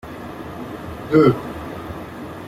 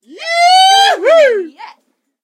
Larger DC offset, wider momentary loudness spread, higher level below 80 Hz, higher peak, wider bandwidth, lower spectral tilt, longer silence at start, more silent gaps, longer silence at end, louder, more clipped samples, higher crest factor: neither; first, 18 LU vs 12 LU; first, -46 dBFS vs under -90 dBFS; about the same, -2 dBFS vs 0 dBFS; about the same, 15.5 kHz vs 15 kHz; first, -8 dB/octave vs 2.5 dB/octave; about the same, 0.05 s vs 0.1 s; neither; second, 0 s vs 0.55 s; second, -20 LUFS vs -9 LUFS; neither; first, 20 dB vs 12 dB